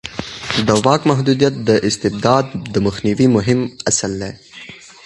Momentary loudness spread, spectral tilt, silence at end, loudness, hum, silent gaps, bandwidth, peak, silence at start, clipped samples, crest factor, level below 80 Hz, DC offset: 14 LU; -5 dB/octave; 0.2 s; -16 LUFS; none; none; 11.5 kHz; 0 dBFS; 0.05 s; under 0.1%; 16 dB; -44 dBFS; under 0.1%